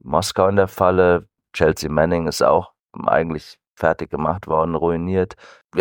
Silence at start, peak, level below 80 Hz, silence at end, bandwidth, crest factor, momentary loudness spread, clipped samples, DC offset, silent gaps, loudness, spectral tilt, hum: 0.05 s; -2 dBFS; -44 dBFS; 0 s; 17 kHz; 18 dB; 10 LU; under 0.1%; under 0.1%; 2.80-2.89 s, 3.71-3.75 s, 5.65-5.69 s; -19 LUFS; -5.5 dB/octave; none